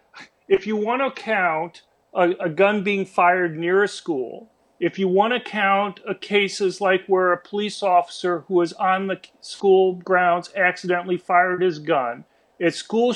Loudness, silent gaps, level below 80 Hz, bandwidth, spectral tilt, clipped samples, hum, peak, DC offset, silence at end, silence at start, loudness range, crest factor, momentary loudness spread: -21 LUFS; none; -70 dBFS; 10.5 kHz; -5 dB/octave; under 0.1%; none; -4 dBFS; under 0.1%; 0 s; 0.15 s; 2 LU; 16 dB; 9 LU